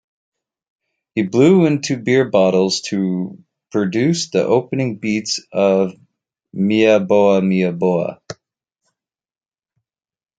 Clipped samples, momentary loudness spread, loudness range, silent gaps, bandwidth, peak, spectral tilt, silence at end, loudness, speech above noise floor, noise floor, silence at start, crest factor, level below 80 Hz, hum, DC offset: under 0.1%; 12 LU; 3 LU; none; 9.2 kHz; 0 dBFS; -5.5 dB/octave; 2.05 s; -17 LUFS; over 74 dB; under -90 dBFS; 1.15 s; 16 dB; -62 dBFS; none; under 0.1%